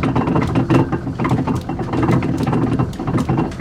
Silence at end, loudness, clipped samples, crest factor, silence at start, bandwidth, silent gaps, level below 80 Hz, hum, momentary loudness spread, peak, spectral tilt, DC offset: 0 s; -18 LUFS; under 0.1%; 16 dB; 0 s; 12 kHz; none; -36 dBFS; none; 5 LU; -2 dBFS; -8 dB/octave; under 0.1%